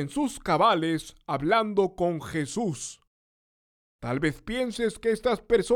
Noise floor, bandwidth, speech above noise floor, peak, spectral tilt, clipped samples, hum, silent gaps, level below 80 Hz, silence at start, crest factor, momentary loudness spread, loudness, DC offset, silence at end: under -90 dBFS; 17 kHz; over 64 dB; -8 dBFS; -5 dB/octave; under 0.1%; none; 3.07-3.99 s; -52 dBFS; 0 s; 20 dB; 10 LU; -27 LUFS; under 0.1%; 0 s